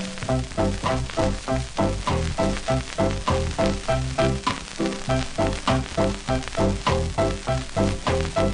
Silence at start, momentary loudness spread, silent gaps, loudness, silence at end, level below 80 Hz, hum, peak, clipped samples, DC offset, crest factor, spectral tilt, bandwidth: 0 s; 4 LU; none; -25 LUFS; 0 s; -32 dBFS; none; -6 dBFS; under 0.1%; under 0.1%; 18 dB; -5.5 dB/octave; 10.5 kHz